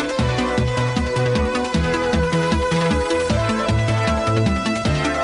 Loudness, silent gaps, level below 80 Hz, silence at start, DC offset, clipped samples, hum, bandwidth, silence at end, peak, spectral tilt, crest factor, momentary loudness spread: -19 LUFS; none; -30 dBFS; 0 s; under 0.1%; under 0.1%; none; 11 kHz; 0 s; -6 dBFS; -6 dB/octave; 12 dB; 2 LU